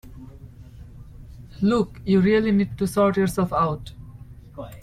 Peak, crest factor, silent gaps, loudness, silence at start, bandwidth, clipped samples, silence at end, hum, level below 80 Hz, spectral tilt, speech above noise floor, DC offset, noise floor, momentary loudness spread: -8 dBFS; 14 dB; none; -22 LUFS; 0.05 s; 15 kHz; under 0.1%; 0 s; none; -44 dBFS; -7 dB/octave; 22 dB; under 0.1%; -43 dBFS; 24 LU